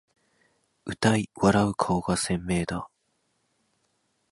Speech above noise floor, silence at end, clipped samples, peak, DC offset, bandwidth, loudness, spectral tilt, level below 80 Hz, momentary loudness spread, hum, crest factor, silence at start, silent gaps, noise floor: 48 dB; 1.45 s; under 0.1%; -8 dBFS; under 0.1%; 11.5 kHz; -26 LUFS; -5.5 dB/octave; -50 dBFS; 16 LU; none; 20 dB; 0.85 s; none; -73 dBFS